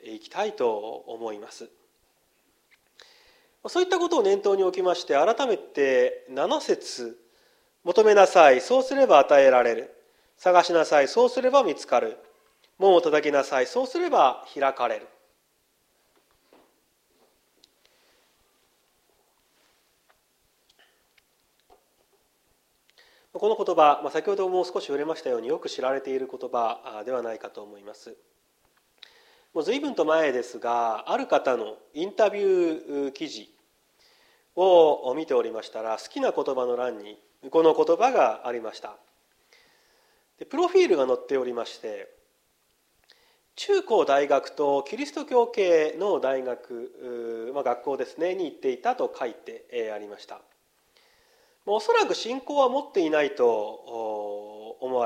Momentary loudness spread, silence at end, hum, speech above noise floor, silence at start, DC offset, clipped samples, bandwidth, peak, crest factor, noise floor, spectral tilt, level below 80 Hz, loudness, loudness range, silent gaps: 17 LU; 0 s; none; 45 dB; 0.05 s; under 0.1%; under 0.1%; 11.5 kHz; -2 dBFS; 24 dB; -69 dBFS; -3.5 dB/octave; -78 dBFS; -24 LUFS; 12 LU; none